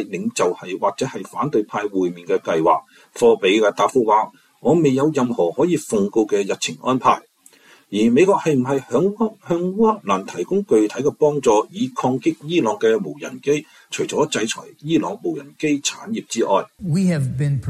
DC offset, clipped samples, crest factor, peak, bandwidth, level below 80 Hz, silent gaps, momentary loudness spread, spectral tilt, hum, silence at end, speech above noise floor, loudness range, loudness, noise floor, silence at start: under 0.1%; under 0.1%; 16 dB; -4 dBFS; 14 kHz; -56 dBFS; none; 9 LU; -5.5 dB/octave; none; 0 s; 32 dB; 4 LU; -20 LUFS; -51 dBFS; 0 s